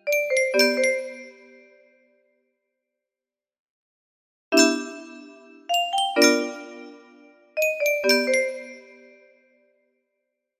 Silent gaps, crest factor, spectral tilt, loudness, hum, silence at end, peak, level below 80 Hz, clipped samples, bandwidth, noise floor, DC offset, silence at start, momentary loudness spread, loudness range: 3.59-4.51 s; 22 dB; -0.5 dB/octave; -21 LUFS; none; 1.8 s; -4 dBFS; -76 dBFS; under 0.1%; 15.5 kHz; under -90 dBFS; under 0.1%; 0.05 s; 22 LU; 4 LU